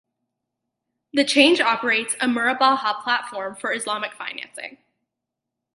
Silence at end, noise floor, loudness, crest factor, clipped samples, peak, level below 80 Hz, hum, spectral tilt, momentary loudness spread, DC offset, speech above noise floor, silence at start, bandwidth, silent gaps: 1.05 s; -83 dBFS; -20 LUFS; 22 dB; under 0.1%; 0 dBFS; -76 dBFS; none; -1.5 dB/octave; 16 LU; under 0.1%; 62 dB; 1.15 s; 11.5 kHz; none